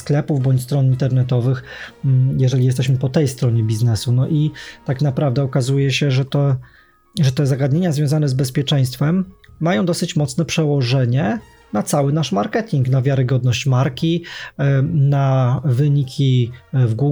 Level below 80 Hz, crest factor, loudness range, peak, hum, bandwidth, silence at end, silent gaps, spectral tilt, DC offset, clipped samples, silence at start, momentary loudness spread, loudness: -50 dBFS; 12 dB; 1 LU; -4 dBFS; none; 13 kHz; 0 s; none; -6.5 dB/octave; under 0.1%; under 0.1%; 0 s; 5 LU; -18 LUFS